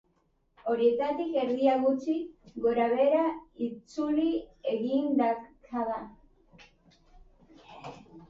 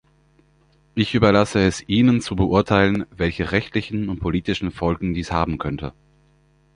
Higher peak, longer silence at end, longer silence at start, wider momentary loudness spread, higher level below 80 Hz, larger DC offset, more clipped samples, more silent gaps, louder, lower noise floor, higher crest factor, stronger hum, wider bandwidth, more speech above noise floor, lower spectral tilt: second, -12 dBFS vs -2 dBFS; second, 0.05 s vs 0.85 s; second, 0.65 s vs 0.95 s; first, 14 LU vs 10 LU; second, -64 dBFS vs -38 dBFS; neither; neither; neither; second, -29 LUFS vs -21 LUFS; first, -71 dBFS vs -58 dBFS; about the same, 18 dB vs 20 dB; neither; second, 7.6 kHz vs 10.5 kHz; first, 43 dB vs 38 dB; about the same, -6.5 dB/octave vs -6.5 dB/octave